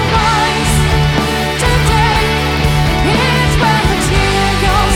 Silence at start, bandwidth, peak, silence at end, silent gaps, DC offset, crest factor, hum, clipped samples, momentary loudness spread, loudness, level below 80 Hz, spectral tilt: 0 s; 17 kHz; 0 dBFS; 0 s; none; under 0.1%; 12 dB; none; under 0.1%; 2 LU; -12 LUFS; -18 dBFS; -4.5 dB/octave